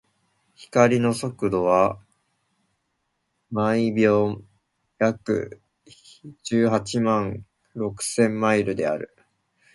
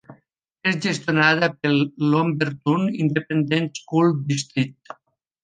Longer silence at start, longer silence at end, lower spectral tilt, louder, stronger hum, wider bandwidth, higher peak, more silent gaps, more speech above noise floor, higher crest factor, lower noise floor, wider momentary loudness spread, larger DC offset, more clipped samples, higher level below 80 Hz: first, 0.6 s vs 0.1 s; about the same, 0.7 s vs 0.7 s; about the same, -6 dB/octave vs -5.5 dB/octave; about the same, -23 LUFS vs -21 LUFS; neither; first, 12 kHz vs 9.6 kHz; about the same, -2 dBFS vs -2 dBFS; neither; first, 53 dB vs 42 dB; about the same, 22 dB vs 20 dB; first, -75 dBFS vs -63 dBFS; first, 15 LU vs 7 LU; neither; neither; first, -58 dBFS vs -66 dBFS